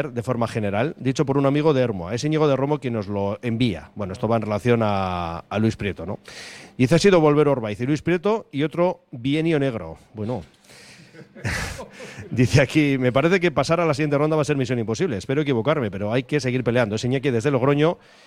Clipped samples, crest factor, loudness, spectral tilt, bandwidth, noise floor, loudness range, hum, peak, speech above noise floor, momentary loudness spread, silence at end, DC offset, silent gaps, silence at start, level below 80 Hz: under 0.1%; 16 dB; -22 LUFS; -6.5 dB/octave; 14.5 kHz; -47 dBFS; 5 LU; none; -4 dBFS; 25 dB; 11 LU; 0.3 s; under 0.1%; none; 0 s; -48 dBFS